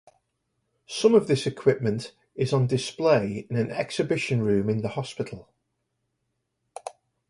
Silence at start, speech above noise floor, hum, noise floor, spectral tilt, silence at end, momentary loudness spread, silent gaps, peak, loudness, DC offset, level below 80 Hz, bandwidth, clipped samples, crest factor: 0.9 s; 54 dB; none; -78 dBFS; -6 dB/octave; 0.4 s; 18 LU; none; -8 dBFS; -25 LUFS; under 0.1%; -60 dBFS; 11.5 kHz; under 0.1%; 20 dB